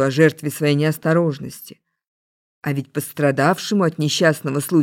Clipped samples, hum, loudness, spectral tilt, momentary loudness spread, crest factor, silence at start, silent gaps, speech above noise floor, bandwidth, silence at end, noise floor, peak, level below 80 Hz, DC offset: under 0.1%; none; -19 LUFS; -5.5 dB/octave; 11 LU; 18 dB; 0 s; 2.07-2.62 s; over 71 dB; 17 kHz; 0 s; under -90 dBFS; -2 dBFS; -66 dBFS; under 0.1%